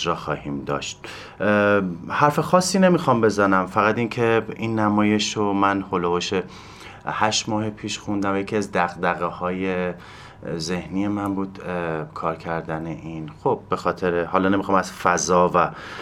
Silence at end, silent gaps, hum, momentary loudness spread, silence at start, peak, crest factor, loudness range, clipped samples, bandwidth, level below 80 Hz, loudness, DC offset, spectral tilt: 0 s; none; none; 12 LU; 0 s; 0 dBFS; 22 dB; 7 LU; under 0.1%; 15.5 kHz; -52 dBFS; -22 LUFS; under 0.1%; -5 dB/octave